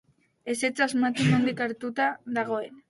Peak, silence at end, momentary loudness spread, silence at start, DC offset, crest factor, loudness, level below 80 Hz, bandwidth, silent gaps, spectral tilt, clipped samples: -10 dBFS; 0.1 s; 8 LU; 0.45 s; under 0.1%; 18 dB; -26 LUFS; -66 dBFS; 11.5 kHz; none; -5.5 dB/octave; under 0.1%